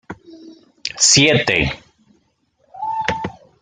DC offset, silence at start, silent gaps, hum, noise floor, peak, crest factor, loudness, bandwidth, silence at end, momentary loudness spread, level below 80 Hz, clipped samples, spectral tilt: under 0.1%; 0.1 s; none; none; -63 dBFS; 0 dBFS; 20 dB; -15 LUFS; 11 kHz; 0.3 s; 23 LU; -44 dBFS; under 0.1%; -2.5 dB/octave